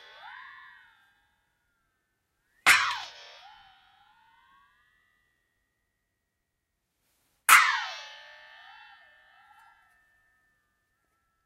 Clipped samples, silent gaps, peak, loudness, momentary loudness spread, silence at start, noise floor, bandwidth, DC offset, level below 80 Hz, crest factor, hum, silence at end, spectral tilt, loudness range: under 0.1%; none; -2 dBFS; -22 LUFS; 29 LU; 0.25 s; -81 dBFS; 16 kHz; under 0.1%; -78 dBFS; 30 dB; none; 3.4 s; 2 dB/octave; 6 LU